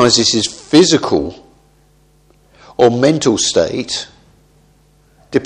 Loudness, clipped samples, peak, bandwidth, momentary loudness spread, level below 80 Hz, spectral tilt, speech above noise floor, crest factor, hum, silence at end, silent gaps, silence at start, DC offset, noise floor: -13 LUFS; under 0.1%; 0 dBFS; 10.5 kHz; 13 LU; -46 dBFS; -3.5 dB/octave; 39 dB; 16 dB; none; 0 s; none; 0 s; under 0.1%; -51 dBFS